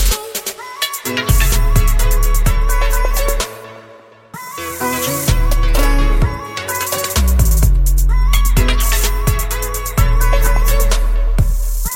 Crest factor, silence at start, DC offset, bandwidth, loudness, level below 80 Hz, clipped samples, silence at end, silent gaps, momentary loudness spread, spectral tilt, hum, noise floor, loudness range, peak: 12 dB; 0 s; under 0.1%; 17 kHz; -16 LUFS; -14 dBFS; under 0.1%; 0 s; none; 8 LU; -4 dB/octave; none; -41 dBFS; 4 LU; 0 dBFS